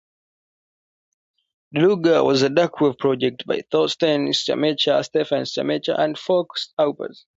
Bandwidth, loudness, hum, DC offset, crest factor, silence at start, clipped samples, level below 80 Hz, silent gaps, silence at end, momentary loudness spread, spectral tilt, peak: 8 kHz; -20 LUFS; none; under 0.1%; 16 dB; 1.75 s; under 0.1%; -66 dBFS; 6.73-6.77 s; 0.25 s; 6 LU; -5 dB/octave; -6 dBFS